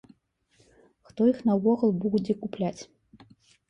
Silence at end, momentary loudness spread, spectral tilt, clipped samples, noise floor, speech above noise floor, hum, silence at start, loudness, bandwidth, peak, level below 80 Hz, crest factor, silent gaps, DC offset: 0.85 s; 22 LU; -8 dB/octave; under 0.1%; -67 dBFS; 41 dB; none; 1.15 s; -26 LUFS; 8.2 kHz; -12 dBFS; -66 dBFS; 16 dB; none; under 0.1%